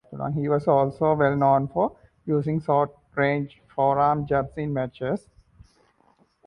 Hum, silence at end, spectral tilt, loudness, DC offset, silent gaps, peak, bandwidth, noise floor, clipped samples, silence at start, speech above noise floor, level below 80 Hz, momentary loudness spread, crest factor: none; 1.3 s; -9.5 dB/octave; -24 LUFS; under 0.1%; none; -8 dBFS; 9.8 kHz; -63 dBFS; under 0.1%; 0.1 s; 40 dB; -54 dBFS; 9 LU; 18 dB